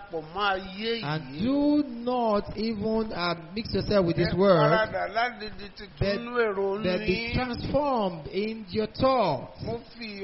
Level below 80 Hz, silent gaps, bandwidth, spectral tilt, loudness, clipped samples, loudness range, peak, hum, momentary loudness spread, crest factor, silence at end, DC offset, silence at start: -46 dBFS; none; 6 kHz; -4.5 dB/octave; -27 LUFS; under 0.1%; 3 LU; -8 dBFS; none; 10 LU; 20 dB; 0 s; under 0.1%; 0 s